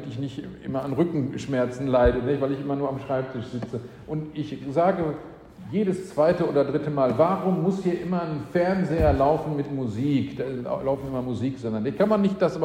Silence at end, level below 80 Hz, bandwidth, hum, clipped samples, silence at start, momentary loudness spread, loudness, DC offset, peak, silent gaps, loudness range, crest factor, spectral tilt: 0 s; -42 dBFS; 11 kHz; none; under 0.1%; 0 s; 12 LU; -25 LUFS; under 0.1%; -8 dBFS; none; 4 LU; 18 dB; -8 dB/octave